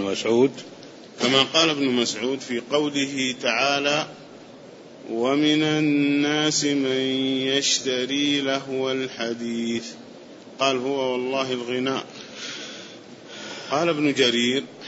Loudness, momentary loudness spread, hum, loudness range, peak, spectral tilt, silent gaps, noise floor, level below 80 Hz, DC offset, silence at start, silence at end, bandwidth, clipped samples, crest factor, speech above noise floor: -22 LUFS; 18 LU; none; 6 LU; -4 dBFS; -3 dB/octave; none; -44 dBFS; -72 dBFS; under 0.1%; 0 s; 0 s; 8 kHz; under 0.1%; 20 dB; 21 dB